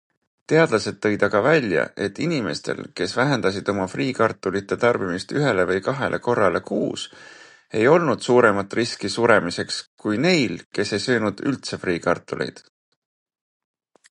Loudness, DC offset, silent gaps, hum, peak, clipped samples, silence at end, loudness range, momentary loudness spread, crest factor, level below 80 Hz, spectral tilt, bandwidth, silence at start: -21 LUFS; under 0.1%; 9.87-9.98 s, 10.66-10.71 s; none; -2 dBFS; under 0.1%; 1.55 s; 3 LU; 9 LU; 20 dB; -56 dBFS; -5 dB/octave; 11 kHz; 0.5 s